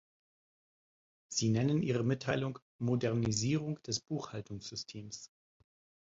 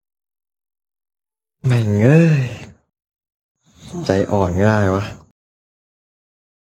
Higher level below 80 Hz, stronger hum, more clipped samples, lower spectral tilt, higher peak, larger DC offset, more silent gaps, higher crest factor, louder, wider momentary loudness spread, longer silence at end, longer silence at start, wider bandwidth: second, -66 dBFS vs -50 dBFS; neither; neither; second, -5 dB/octave vs -8 dB/octave; second, -16 dBFS vs 0 dBFS; neither; about the same, 2.62-2.79 s vs 3.34-3.55 s; about the same, 20 dB vs 18 dB; second, -35 LUFS vs -16 LUFS; second, 12 LU vs 16 LU; second, 0.85 s vs 1.65 s; second, 1.3 s vs 1.65 s; second, 8 kHz vs 9.8 kHz